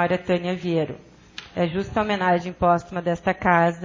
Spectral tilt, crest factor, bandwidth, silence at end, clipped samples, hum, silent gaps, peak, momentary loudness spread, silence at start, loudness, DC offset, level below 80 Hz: -7 dB/octave; 18 dB; 7.6 kHz; 0 s; under 0.1%; none; none; -4 dBFS; 13 LU; 0 s; -23 LUFS; under 0.1%; -48 dBFS